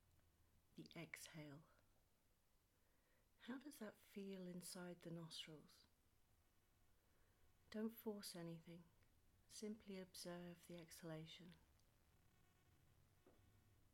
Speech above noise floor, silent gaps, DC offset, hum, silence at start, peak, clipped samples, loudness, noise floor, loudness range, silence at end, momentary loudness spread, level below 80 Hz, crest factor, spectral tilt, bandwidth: 25 dB; none; under 0.1%; none; 0 s; -38 dBFS; under 0.1%; -57 LUFS; -81 dBFS; 7 LU; 0.05 s; 11 LU; -84 dBFS; 22 dB; -4.5 dB/octave; 17.5 kHz